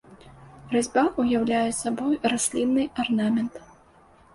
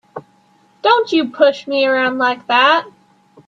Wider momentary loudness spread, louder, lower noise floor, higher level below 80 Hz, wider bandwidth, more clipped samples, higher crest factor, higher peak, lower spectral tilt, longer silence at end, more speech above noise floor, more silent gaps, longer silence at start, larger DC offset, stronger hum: second, 4 LU vs 7 LU; second, -24 LUFS vs -15 LUFS; about the same, -55 dBFS vs -54 dBFS; first, -56 dBFS vs -68 dBFS; first, 11.5 kHz vs 7.6 kHz; neither; about the same, 18 dB vs 16 dB; second, -8 dBFS vs 0 dBFS; about the same, -4 dB/octave vs -4 dB/octave; about the same, 0.7 s vs 0.6 s; second, 31 dB vs 39 dB; neither; about the same, 0.1 s vs 0.15 s; neither; neither